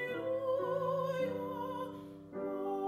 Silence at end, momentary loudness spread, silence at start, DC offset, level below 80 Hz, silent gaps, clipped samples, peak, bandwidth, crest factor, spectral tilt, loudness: 0 s; 9 LU; 0 s; under 0.1%; -74 dBFS; none; under 0.1%; -24 dBFS; 14.5 kHz; 12 dB; -7 dB/octave; -37 LUFS